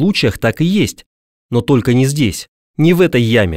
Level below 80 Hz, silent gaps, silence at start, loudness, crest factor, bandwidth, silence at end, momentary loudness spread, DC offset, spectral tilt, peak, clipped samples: -40 dBFS; 1.06-1.49 s, 2.48-2.74 s; 0 s; -14 LUFS; 12 dB; 16 kHz; 0 s; 8 LU; under 0.1%; -6 dB/octave; -2 dBFS; under 0.1%